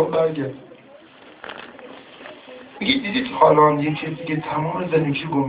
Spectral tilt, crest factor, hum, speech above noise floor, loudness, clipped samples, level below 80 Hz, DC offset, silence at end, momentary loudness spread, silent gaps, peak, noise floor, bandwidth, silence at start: -10 dB/octave; 22 dB; none; 27 dB; -20 LUFS; under 0.1%; -58 dBFS; under 0.1%; 0 s; 24 LU; none; 0 dBFS; -46 dBFS; 4 kHz; 0 s